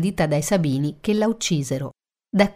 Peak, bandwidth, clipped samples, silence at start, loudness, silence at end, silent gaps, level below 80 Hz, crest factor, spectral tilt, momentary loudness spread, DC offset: -4 dBFS; 16 kHz; under 0.1%; 0 s; -22 LUFS; 0.05 s; none; -50 dBFS; 18 dB; -5.5 dB/octave; 7 LU; under 0.1%